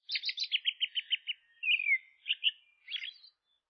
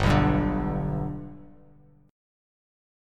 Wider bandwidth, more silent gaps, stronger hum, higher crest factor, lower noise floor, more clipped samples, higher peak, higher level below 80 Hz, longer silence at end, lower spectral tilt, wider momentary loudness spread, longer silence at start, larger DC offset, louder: second, 6.2 kHz vs 11.5 kHz; neither; second, none vs 50 Hz at -55 dBFS; about the same, 18 dB vs 20 dB; first, -64 dBFS vs -56 dBFS; neither; second, -18 dBFS vs -8 dBFS; second, under -90 dBFS vs -38 dBFS; second, 0.45 s vs 1 s; second, 13 dB/octave vs -7.5 dB/octave; second, 11 LU vs 17 LU; about the same, 0.1 s vs 0 s; neither; second, -32 LUFS vs -26 LUFS